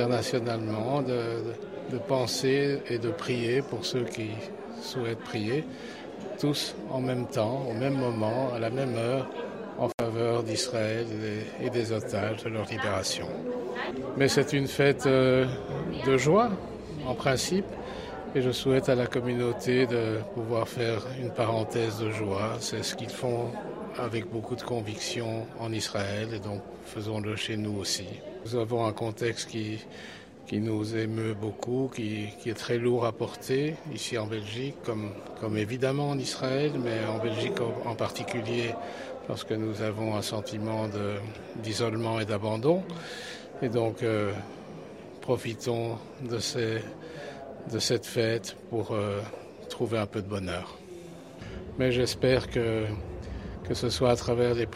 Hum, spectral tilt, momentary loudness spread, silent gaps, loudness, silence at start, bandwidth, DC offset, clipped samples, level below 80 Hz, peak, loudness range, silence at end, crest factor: none; -5.5 dB/octave; 13 LU; 9.94-9.98 s; -30 LUFS; 0 s; 15.5 kHz; under 0.1%; under 0.1%; -56 dBFS; -10 dBFS; 6 LU; 0 s; 20 dB